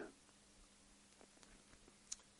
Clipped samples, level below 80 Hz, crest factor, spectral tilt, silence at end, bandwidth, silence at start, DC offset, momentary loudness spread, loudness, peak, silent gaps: under 0.1%; -76 dBFS; 34 dB; -1.5 dB/octave; 0 s; 11.5 kHz; 0 s; under 0.1%; 13 LU; -61 LUFS; -26 dBFS; none